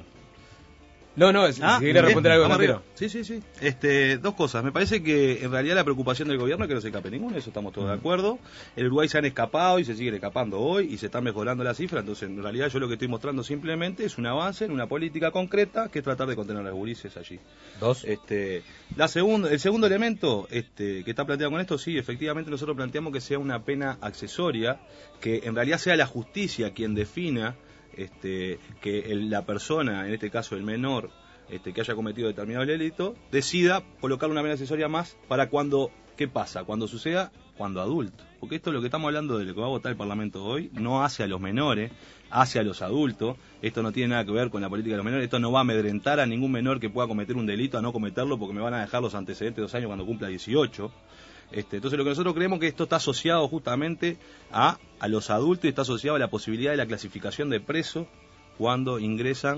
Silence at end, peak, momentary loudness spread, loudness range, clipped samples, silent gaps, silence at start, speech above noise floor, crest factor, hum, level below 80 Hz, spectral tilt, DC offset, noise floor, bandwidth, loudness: 0 s; -6 dBFS; 11 LU; 6 LU; under 0.1%; none; 0 s; 25 dB; 22 dB; none; -56 dBFS; -5.5 dB/octave; under 0.1%; -52 dBFS; 8 kHz; -27 LUFS